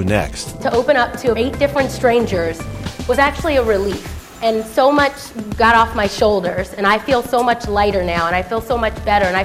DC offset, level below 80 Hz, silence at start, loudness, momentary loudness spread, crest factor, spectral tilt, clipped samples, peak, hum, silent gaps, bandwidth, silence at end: under 0.1%; -32 dBFS; 0 s; -16 LUFS; 9 LU; 16 dB; -5 dB/octave; under 0.1%; 0 dBFS; none; none; 16 kHz; 0 s